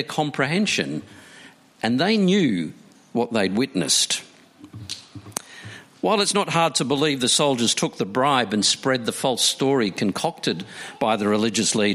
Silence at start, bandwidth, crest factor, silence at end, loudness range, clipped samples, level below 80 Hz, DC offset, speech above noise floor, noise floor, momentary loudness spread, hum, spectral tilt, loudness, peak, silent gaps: 0 s; 15.5 kHz; 18 dB; 0 s; 4 LU; under 0.1%; -66 dBFS; under 0.1%; 26 dB; -48 dBFS; 15 LU; none; -3.5 dB/octave; -21 LUFS; -4 dBFS; none